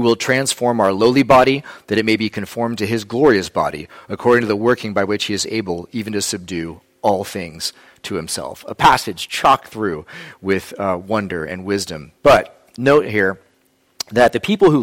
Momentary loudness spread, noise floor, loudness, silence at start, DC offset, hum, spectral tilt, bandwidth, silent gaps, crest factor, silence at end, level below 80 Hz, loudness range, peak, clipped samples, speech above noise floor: 13 LU; -60 dBFS; -17 LUFS; 0 s; under 0.1%; none; -4.5 dB/octave; 16.5 kHz; none; 16 dB; 0 s; -48 dBFS; 5 LU; -2 dBFS; under 0.1%; 42 dB